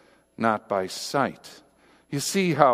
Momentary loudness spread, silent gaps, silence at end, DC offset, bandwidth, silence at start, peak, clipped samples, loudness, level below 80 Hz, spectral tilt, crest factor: 11 LU; none; 0 s; under 0.1%; 15.5 kHz; 0.4 s; 0 dBFS; under 0.1%; -26 LUFS; -68 dBFS; -4.5 dB/octave; 26 dB